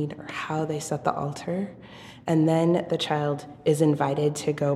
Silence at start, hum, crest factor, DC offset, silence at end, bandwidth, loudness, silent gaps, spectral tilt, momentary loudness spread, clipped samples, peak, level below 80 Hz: 0 s; none; 18 dB; under 0.1%; 0 s; 14 kHz; -26 LUFS; none; -6 dB/octave; 11 LU; under 0.1%; -8 dBFS; -62 dBFS